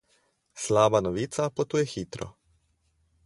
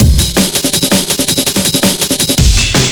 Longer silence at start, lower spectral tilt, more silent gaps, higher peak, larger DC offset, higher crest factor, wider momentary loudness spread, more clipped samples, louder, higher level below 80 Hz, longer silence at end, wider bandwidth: first, 0.55 s vs 0 s; first, -5 dB/octave vs -3 dB/octave; neither; second, -6 dBFS vs 0 dBFS; neither; first, 22 dB vs 10 dB; first, 16 LU vs 2 LU; neither; second, -27 LUFS vs -10 LUFS; second, -56 dBFS vs -16 dBFS; first, 0.95 s vs 0 s; second, 11.5 kHz vs over 20 kHz